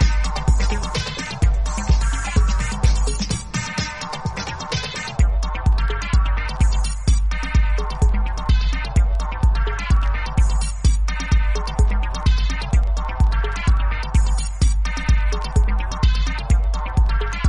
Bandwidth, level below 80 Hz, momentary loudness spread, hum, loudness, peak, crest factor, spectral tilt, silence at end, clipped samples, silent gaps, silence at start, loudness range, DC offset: 11 kHz; -18 dBFS; 4 LU; none; -21 LUFS; -4 dBFS; 14 dB; -5 dB/octave; 0 s; under 0.1%; none; 0 s; 2 LU; under 0.1%